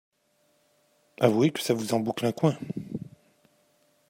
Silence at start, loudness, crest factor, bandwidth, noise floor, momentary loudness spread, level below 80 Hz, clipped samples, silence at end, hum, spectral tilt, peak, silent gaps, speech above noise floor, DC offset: 1.2 s; -27 LUFS; 24 dB; 16 kHz; -69 dBFS; 16 LU; -70 dBFS; under 0.1%; 1.05 s; none; -6 dB/octave; -6 dBFS; none; 44 dB; under 0.1%